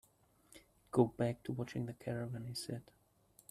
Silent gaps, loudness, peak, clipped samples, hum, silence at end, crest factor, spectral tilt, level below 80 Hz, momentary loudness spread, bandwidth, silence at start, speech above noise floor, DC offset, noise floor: none; -39 LUFS; -16 dBFS; under 0.1%; none; 0.7 s; 26 dB; -6.5 dB/octave; -70 dBFS; 10 LU; 14 kHz; 0.55 s; 31 dB; under 0.1%; -70 dBFS